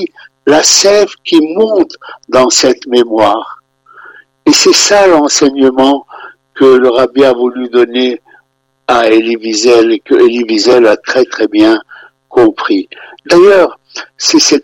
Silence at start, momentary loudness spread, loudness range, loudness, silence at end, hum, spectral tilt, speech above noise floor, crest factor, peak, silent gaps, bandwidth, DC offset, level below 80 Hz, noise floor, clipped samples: 0 s; 10 LU; 2 LU; -8 LUFS; 0 s; none; -2.5 dB/octave; 47 dB; 8 dB; 0 dBFS; none; 19 kHz; under 0.1%; -48 dBFS; -55 dBFS; 0.3%